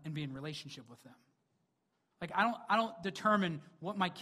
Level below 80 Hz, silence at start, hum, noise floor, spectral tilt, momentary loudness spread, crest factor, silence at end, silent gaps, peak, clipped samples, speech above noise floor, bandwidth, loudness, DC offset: -76 dBFS; 0 s; none; -81 dBFS; -5.5 dB/octave; 15 LU; 22 dB; 0 s; none; -16 dBFS; under 0.1%; 45 dB; 14 kHz; -35 LUFS; under 0.1%